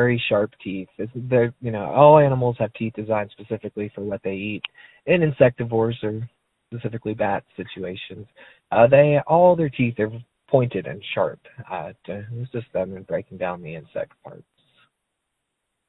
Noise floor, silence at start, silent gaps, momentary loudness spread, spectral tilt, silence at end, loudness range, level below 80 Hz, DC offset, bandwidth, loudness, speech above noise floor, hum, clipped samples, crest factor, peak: -78 dBFS; 0 s; none; 18 LU; -10.5 dB/octave; 1.55 s; 11 LU; -56 dBFS; under 0.1%; 4.1 kHz; -21 LUFS; 57 dB; none; under 0.1%; 22 dB; 0 dBFS